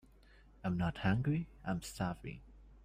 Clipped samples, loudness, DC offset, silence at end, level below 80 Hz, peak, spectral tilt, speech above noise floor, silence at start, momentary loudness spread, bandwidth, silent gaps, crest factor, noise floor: under 0.1%; -38 LUFS; under 0.1%; 0.05 s; -56 dBFS; -22 dBFS; -6.5 dB/octave; 25 dB; 0.65 s; 13 LU; 15.5 kHz; none; 18 dB; -62 dBFS